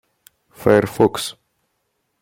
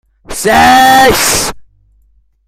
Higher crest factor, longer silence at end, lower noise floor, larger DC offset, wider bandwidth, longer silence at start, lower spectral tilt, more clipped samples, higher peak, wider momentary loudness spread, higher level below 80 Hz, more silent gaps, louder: first, 20 dB vs 10 dB; about the same, 0.9 s vs 0.85 s; first, -71 dBFS vs -51 dBFS; neither; about the same, 16.5 kHz vs 16.5 kHz; first, 0.6 s vs 0.3 s; first, -5.5 dB/octave vs -2 dB/octave; second, under 0.1% vs 0.3%; about the same, -2 dBFS vs 0 dBFS; about the same, 12 LU vs 13 LU; second, -50 dBFS vs -32 dBFS; neither; second, -18 LUFS vs -7 LUFS